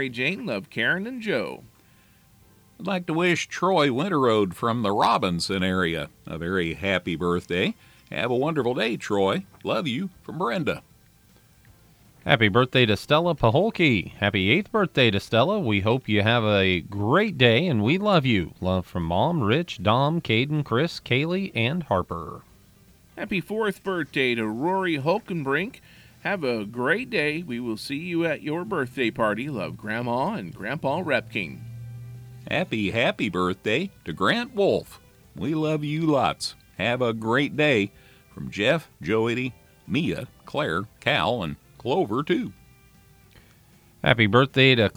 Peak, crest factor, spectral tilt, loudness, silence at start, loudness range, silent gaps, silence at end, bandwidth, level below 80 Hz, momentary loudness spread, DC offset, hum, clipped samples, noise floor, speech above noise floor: -2 dBFS; 22 dB; -6 dB/octave; -24 LUFS; 0 s; 6 LU; none; 0.05 s; over 20 kHz; -54 dBFS; 11 LU; under 0.1%; none; under 0.1%; -57 dBFS; 33 dB